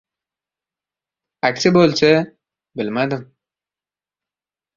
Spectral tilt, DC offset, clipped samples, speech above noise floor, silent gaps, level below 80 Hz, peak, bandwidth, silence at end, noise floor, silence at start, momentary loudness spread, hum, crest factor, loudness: -5.5 dB/octave; under 0.1%; under 0.1%; over 74 dB; none; -58 dBFS; -2 dBFS; 7.6 kHz; 1.55 s; under -90 dBFS; 1.45 s; 15 LU; 50 Hz at -50 dBFS; 20 dB; -17 LUFS